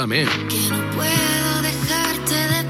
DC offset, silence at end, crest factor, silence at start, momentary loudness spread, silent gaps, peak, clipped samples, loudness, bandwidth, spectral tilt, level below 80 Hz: under 0.1%; 0 s; 14 dB; 0 s; 3 LU; none; -6 dBFS; under 0.1%; -19 LUFS; 16.5 kHz; -3.5 dB/octave; -46 dBFS